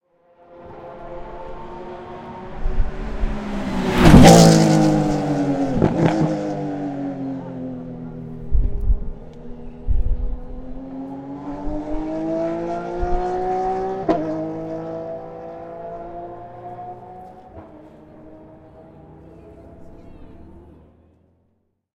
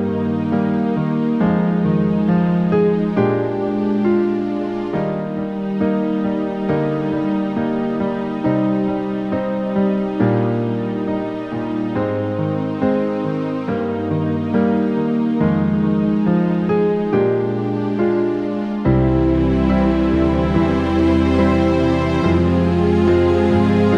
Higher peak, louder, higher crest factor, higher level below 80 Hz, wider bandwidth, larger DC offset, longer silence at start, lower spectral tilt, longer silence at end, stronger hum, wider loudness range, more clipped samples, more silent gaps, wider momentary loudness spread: about the same, 0 dBFS vs -2 dBFS; about the same, -19 LUFS vs -18 LUFS; first, 20 dB vs 14 dB; first, -28 dBFS vs -34 dBFS; first, 16 kHz vs 7.2 kHz; neither; first, 0.5 s vs 0 s; second, -6 dB/octave vs -9 dB/octave; first, 1.25 s vs 0 s; neither; first, 21 LU vs 4 LU; neither; neither; first, 21 LU vs 6 LU